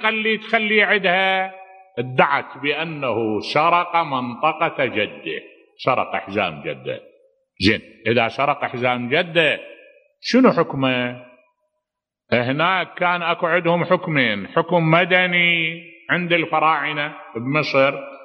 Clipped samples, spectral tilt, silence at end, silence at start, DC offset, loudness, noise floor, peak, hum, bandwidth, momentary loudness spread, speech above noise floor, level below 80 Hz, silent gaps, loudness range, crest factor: under 0.1%; -6 dB/octave; 0 s; 0 s; under 0.1%; -19 LUFS; -84 dBFS; 0 dBFS; none; 9.6 kHz; 12 LU; 64 dB; -60 dBFS; none; 5 LU; 20 dB